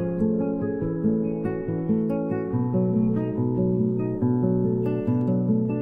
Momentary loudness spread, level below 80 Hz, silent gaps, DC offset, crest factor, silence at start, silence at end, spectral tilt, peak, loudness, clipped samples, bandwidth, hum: 4 LU; -48 dBFS; none; under 0.1%; 14 dB; 0 s; 0 s; -12.5 dB/octave; -10 dBFS; -24 LUFS; under 0.1%; 3.1 kHz; none